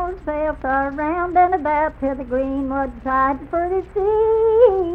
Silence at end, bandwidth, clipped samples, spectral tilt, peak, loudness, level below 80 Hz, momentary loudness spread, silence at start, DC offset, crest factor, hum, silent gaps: 0 s; 4.5 kHz; under 0.1%; -9 dB/octave; -2 dBFS; -19 LUFS; -38 dBFS; 9 LU; 0 s; under 0.1%; 16 dB; none; none